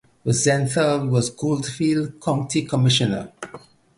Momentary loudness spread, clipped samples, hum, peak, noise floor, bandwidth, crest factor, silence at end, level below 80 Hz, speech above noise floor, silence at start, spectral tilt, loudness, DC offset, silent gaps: 9 LU; under 0.1%; none; -6 dBFS; -44 dBFS; 11.5 kHz; 16 dB; 0.4 s; -54 dBFS; 24 dB; 0.25 s; -5 dB/octave; -21 LUFS; under 0.1%; none